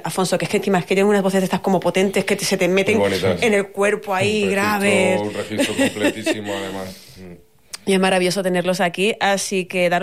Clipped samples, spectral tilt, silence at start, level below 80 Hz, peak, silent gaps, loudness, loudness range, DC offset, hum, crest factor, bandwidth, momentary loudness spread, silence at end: under 0.1%; -4.5 dB/octave; 0 s; -58 dBFS; -6 dBFS; none; -19 LUFS; 3 LU; 0.4%; none; 12 dB; 15.5 kHz; 7 LU; 0 s